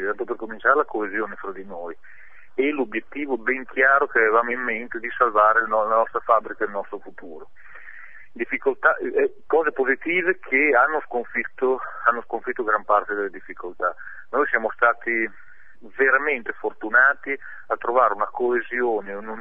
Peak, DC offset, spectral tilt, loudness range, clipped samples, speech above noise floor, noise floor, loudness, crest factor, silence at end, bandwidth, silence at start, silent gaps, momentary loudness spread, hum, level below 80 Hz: -4 dBFS; 1%; -7 dB/octave; 5 LU; under 0.1%; 22 dB; -45 dBFS; -22 LUFS; 20 dB; 0 s; 3.8 kHz; 0 s; none; 16 LU; none; -64 dBFS